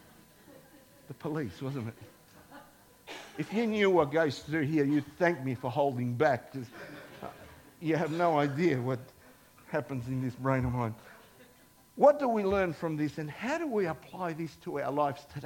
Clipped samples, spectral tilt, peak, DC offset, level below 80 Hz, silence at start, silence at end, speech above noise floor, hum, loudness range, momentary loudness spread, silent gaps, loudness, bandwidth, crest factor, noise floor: under 0.1%; -7 dB/octave; -10 dBFS; under 0.1%; -60 dBFS; 0.5 s; 0 s; 30 dB; none; 6 LU; 19 LU; none; -31 LUFS; 17.5 kHz; 22 dB; -60 dBFS